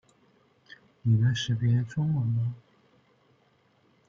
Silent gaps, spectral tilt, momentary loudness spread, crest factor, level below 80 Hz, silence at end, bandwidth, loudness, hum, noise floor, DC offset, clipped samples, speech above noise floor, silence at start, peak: none; -6.5 dB/octave; 9 LU; 16 dB; -62 dBFS; 1.5 s; 7.4 kHz; -27 LUFS; none; -66 dBFS; under 0.1%; under 0.1%; 40 dB; 1.05 s; -14 dBFS